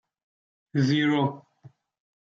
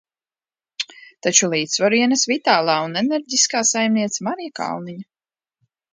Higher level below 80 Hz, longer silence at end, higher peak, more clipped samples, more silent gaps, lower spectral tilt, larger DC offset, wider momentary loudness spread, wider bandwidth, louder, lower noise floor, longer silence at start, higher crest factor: about the same, -72 dBFS vs -72 dBFS; second, 0.7 s vs 0.9 s; second, -12 dBFS vs 0 dBFS; neither; neither; first, -6.5 dB/octave vs -2 dB/octave; neither; about the same, 11 LU vs 13 LU; second, 7.6 kHz vs 10 kHz; second, -25 LUFS vs -18 LUFS; second, -55 dBFS vs under -90 dBFS; about the same, 0.75 s vs 0.8 s; about the same, 16 dB vs 20 dB